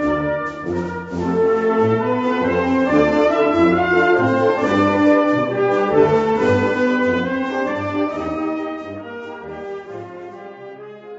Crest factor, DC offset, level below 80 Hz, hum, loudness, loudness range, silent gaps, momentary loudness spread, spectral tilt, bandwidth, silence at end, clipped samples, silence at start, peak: 16 dB; under 0.1%; -48 dBFS; none; -17 LUFS; 9 LU; none; 17 LU; -7 dB/octave; 8 kHz; 0 s; under 0.1%; 0 s; -2 dBFS